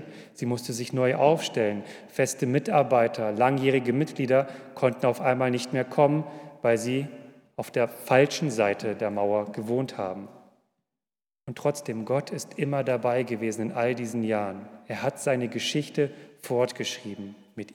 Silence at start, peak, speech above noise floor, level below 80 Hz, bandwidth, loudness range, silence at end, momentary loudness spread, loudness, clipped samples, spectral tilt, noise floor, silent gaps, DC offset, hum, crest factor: 0 s; -6 dBFS; over 64 dB; -80 dBFS; 18.5 kHz; 6 LU; 0 s; 14 LU; -26 LUFS; under 0.1%; -5.5 dB/octave; under -90 dBFS; none; under 0.1%; none; 20 dB